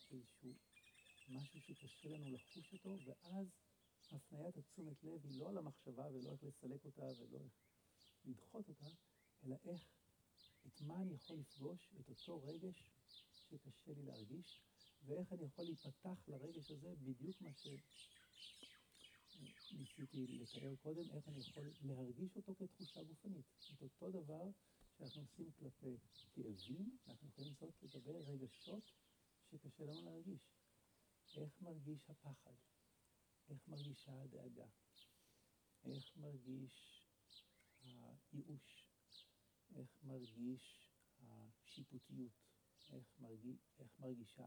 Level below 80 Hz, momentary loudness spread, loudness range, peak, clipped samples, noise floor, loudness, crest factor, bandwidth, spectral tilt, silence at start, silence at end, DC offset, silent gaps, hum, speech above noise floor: -88 dBFS; 13 LU; 6 LU; -38 dBFS; under 0.1%; -80 dBFS; -56 LUFS; 18 dB; over 20 kHz; -6.5 dB/octave; 0 s; 0 s; under 0.1%; none; none; 25 dB